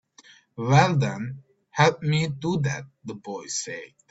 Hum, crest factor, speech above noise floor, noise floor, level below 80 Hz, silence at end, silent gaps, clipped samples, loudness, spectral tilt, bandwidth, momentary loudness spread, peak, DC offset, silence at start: none; 22 dB; 30 dB; -54 dBFS; -58 dBFS; 0.25 s; none; under 0.1%; -24 LUFS; -5 dB/octave; 8 kHz; 19 LU; -4 dBFS; under 0.1%; 0.55 s